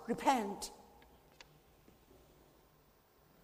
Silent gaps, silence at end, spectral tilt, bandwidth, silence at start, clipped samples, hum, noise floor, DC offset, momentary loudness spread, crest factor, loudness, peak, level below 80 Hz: none; 2.6 s; -4 dB/octave; 15.5 kHz; 0 s; under 0.1%; none; -68 dBFS; under 0.1%; 27 LU; 24 dB; -37 LUFS; -18 dBFS; -70 dBFS